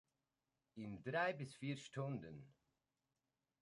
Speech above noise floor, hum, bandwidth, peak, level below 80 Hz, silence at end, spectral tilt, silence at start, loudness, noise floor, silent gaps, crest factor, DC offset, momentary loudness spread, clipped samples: over 44 dB; none; 11 kHz; -28 dBFS; -80 dBFS; 1.1 s; -6 dB/octave; 0.75 s; -46 LUFS; under -90 dBFS; none; 20 dB; under 0.1%; 17 LU; under 0.1%